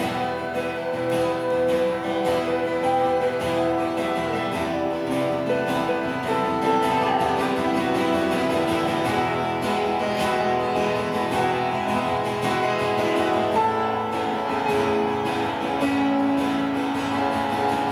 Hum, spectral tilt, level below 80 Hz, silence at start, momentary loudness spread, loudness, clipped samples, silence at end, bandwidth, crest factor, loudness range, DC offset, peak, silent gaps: none; -5.5 dB/octave; -52 dBFS; 0 s; 4 LU; -23 LUFS; under 0.1%; 0 s; 20 kHz; 14 dB; 1 LU; under 0.1%; -8 dBFS; none